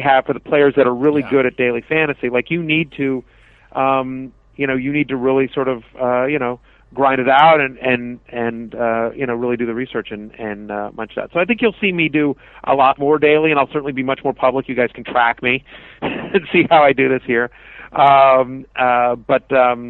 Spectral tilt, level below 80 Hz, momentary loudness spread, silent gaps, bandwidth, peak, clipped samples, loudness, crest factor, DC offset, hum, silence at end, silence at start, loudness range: -8.5 dB/octave; -50 dBFS; 14 LU; none; 4.3 kHz; 0 dBFS; under 0.1%; -16 LUFS; 16 dB; under 0.1%; none; 0 s; 0 s; 5 LU